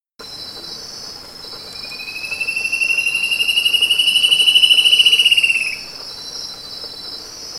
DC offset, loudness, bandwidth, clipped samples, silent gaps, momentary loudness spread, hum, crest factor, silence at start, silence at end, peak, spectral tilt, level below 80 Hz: under 0.1%; -12 LUFS; 16 kHz; under 0.1%; none; 21 LU; none; 18 dB; 0.2 s; 0 s; 0 dBFS; 2 dB/octave; -56 dBFS